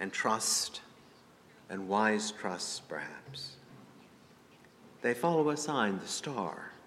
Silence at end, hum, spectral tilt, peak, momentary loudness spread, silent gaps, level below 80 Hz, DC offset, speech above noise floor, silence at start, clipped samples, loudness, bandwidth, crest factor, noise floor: 0 s; none; -3 dB/octave; -14 dBFS; 14 LU; none; -78 dBFS; under 0.1%; 26 dB; 0 s; under 0.1%; -33 LUFS; 16 kHz; 22 dB; -59 dBFS